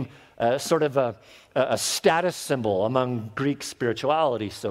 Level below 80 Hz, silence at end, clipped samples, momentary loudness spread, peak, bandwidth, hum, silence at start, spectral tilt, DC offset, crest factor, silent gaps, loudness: -62 dBFS; 0 s; under 0.1%; 7 LU; -6 dBFS; 16 kHz; none; 0 s; -4.5 dB/octave; under 0.1%; 18 dB; none; -25 LUFS